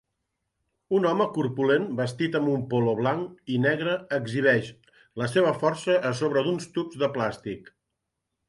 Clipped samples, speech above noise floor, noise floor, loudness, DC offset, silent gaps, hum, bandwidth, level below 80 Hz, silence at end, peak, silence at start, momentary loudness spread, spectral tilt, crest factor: under 0.1%; 57 dB; -82 dBFS; -26 LUFS; under 0.1%; none; none; 11.5 kHz; -66 dBFS; 0.85 s; -8 dBFS; 0.9 s; 9 LU; -6.5 dB/octave; 18 dB